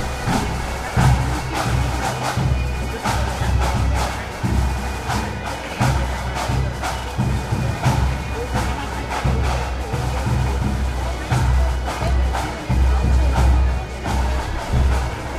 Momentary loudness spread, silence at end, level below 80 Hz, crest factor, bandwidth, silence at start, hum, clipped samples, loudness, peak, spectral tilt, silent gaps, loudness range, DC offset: 7 LU; 0 s; -22 dBFS; 16 dB; 14.5 kHz; 0 s; none; under 0.1%; -21 LUFS; -4 dBFS; -5.5 dB/octave; none; 3 LU; under 0.1%